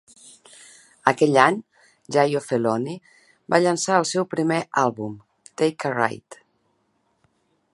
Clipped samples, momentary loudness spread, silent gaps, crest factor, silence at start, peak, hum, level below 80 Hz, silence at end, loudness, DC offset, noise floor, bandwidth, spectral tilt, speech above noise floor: under 0.1%; 16 LU; none; 24 dB; 1.05 s; 0 dBFS; none; -70 dBFS; 1.4 s; -22 LUFS; under 0.1%; -69 dBFS; 11.5 kHz; -4.5 dB/octave; 48 dB